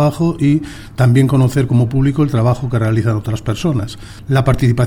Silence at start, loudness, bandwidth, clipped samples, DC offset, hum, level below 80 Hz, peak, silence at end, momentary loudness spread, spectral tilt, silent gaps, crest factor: 0 s; -15 LUFS; 14 kHz; under 0.1%; under 0.1%; none; -34 dBFS; -2 dBFS; 0 s; 8 LU; -7.5 dB/octave; none; 12 dB